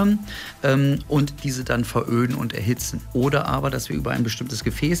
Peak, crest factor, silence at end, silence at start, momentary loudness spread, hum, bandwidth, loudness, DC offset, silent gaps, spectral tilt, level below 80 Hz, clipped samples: -6 dBFS; 16 dB; 0 s; 0 s; 6 LU; none; 16 kHz; -23 LUFS; under 0.1%; none; -5.5 dB/octave; -40 dBFS; under 0.1%